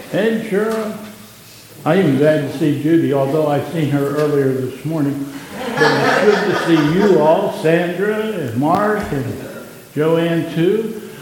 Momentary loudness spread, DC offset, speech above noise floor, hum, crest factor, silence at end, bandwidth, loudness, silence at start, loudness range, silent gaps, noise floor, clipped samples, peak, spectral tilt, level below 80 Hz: 13 LU; under 0.1%; 24 dB; none; 16 dB; 0 s; 17.5 kHz; -16 LUFS; 0 s; 3 LU; none; -40 dBFS; under 0.1%; 0 dBFS; -6.5 dB/octave; -52 dBFS